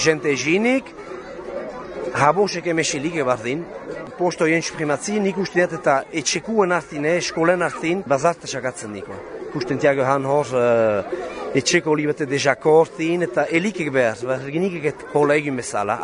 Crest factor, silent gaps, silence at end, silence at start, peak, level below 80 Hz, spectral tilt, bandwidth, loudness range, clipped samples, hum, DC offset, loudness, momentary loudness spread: 20 dB; none; 0 s; 0 s; 0 dBFS; -56 dBFS; -4.5 dB/octave; 10.5 kHz; 3 LU; under 0.1%; none; under 0.1%; -20 LUFS; 13 LU